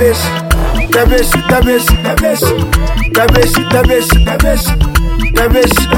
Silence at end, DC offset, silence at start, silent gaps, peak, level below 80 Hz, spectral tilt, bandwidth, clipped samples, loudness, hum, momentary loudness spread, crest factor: 0 s; under 0.1%; 0 s; none; 0 dBFS; -14 dBFS; -4.5 dB/octave; 17.5 kHz; under 0.1%; -11 LUFS; none; 4 LU; 10 dB